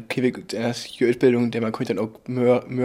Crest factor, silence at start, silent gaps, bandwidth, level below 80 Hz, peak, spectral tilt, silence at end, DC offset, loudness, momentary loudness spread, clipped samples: 16 dB; 0 s; none; 15.5 kHz; -64 dBFS; -6 dBFS; -6.5 dB/octave; 0 s; under 0.1%; -23 LUFS; 8 LU; under 0.1%